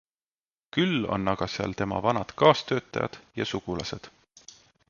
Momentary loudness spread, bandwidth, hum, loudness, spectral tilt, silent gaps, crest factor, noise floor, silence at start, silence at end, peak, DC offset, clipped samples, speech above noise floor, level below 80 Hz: 12 LU; 7.2 kHz; none; -27 LUFS; -5.5 dB/octave; none; 24 dB; under -90 dBFS; 0.75 s; 0.8 s; -4 dBFS; under 0.1%; under 0.1%; over 63 dB; -54 dBFS